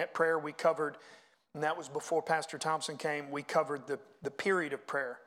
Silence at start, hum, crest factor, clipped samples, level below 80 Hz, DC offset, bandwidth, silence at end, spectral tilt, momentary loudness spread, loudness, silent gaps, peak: 0 s; none; 20 dB; under 0.1%; -86 dBFS; under 0.1%; 15.5 kHz; 0.05 s; -4 dB/octave; 8 LU; -34 LUFS; none; -16 dBFS